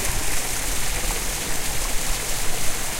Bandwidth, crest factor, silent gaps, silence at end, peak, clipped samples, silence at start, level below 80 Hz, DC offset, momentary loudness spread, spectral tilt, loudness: 16 kHz; 12 dB; none; 0 s; -8 dBFS; under 0.1%; 0 s; -28 dBFS; under 0.1%; 1 LU; -1.5 dB/octave; -25 LUFS